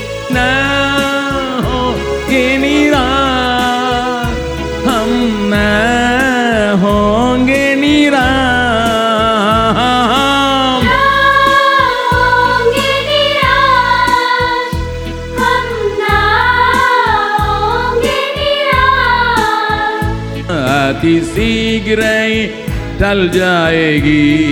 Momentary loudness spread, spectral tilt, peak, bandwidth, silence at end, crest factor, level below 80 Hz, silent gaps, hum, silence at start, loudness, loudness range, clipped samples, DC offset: 6 LU; -5 dB/octave; 0 dBFS; over 20 kHz; 0 s; 12 dB; -28 dBFS; none; none; 0 s; -11 LUFS; 3 LU; under 0.1%; under 0.1%